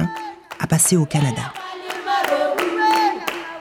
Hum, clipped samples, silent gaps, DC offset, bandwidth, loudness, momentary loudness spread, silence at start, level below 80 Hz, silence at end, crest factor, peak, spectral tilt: none; under 0.1%; none; under 0.1%; 20 kHz; -19 LUFS; 14 LU; 0 s; -54 dBFS; 0 s; 16 dB; -4 dBFS; -4 dB/octave